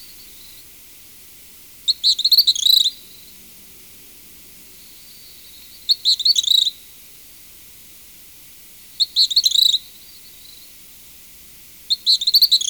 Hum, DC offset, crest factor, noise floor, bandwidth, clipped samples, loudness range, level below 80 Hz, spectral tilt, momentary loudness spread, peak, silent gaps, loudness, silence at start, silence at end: none; under 0.1%; 16 dB; -42 dBFS; over 20 kHz; under 0.1%; 4 LU; -60 dBFS; 2.5 dB/octave; 27 LU; -6 dBFS; none; -14 LUFS; 0 s; 0 s